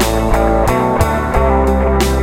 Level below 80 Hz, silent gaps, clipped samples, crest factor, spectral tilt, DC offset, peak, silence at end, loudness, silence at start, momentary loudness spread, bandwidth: -18 dBFS; none; under 0.1%; 12 dB; -6 dB/octave; under 0.1%; 0 dBFS; 0 s; -14 LUFS; 0 s; 2 LU; 16.5 kHz